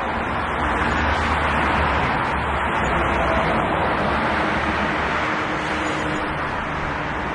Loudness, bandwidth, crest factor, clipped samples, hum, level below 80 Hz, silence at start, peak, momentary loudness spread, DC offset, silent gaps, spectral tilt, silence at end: -21 LUFS; 11.5 kHz; 14 dB; under 0.1%; none; -34 dBFS; 0 s; -8 dBFS; 5 LU; under 0.1%; none; -5.5 dB/octave; 0 s